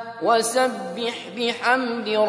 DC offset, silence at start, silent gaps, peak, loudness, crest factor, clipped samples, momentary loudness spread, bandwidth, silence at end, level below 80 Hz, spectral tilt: under 0.1%; 0 s; none; -6 dBFS; -22 LUFS; 16 dB; under 0.1%; 8 LU; 11 kHz; 0 s; -76 dBFS; -2.5 dB/octave